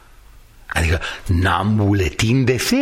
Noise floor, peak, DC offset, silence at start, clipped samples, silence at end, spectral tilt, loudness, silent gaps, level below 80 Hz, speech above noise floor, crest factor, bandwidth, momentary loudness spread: -44 dBFS; -4 dBFS; under 0.1%; 0.7 s; under 0.1%; 0 s; -5.5 dB/octave; -18 LUFS; none; -32 dBFS; 27 dB; 16 dB; 16 kHz; 5 LU